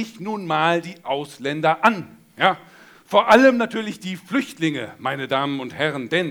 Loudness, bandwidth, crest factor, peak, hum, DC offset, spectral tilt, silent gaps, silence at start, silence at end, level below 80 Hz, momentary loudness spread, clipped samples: -21 LUFS; 20 kHz; 20 dB; 0 dBFS; none; under 0.1%; -5 dB/octave; none; 0 s; 0 s; -64 dBFS; 14 LU; under 0.1%